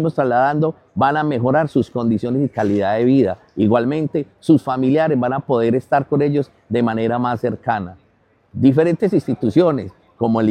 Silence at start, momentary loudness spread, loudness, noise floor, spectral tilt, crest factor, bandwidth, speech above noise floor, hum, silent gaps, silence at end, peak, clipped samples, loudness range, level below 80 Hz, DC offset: 0 s; 7 LU; -18 LUFS; -58 dBFS; -9 dB/octave; 16 dB; 10 kHz; 41 dB; none; none; 0 s; -2 dBFS; under 0.1%; 2 LU; -56 dBFS; under 0.1%